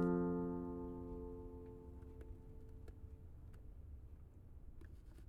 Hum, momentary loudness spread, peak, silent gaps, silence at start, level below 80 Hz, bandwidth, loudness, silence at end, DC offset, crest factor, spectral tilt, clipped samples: none; 18 LU; -26 dBFS; none; 0 s; -56 dBFS; 3.1 kHz; -48 LUFS; 0 s; under 0.1%; 20 dB; -10.5 dB/octave; under 0.1%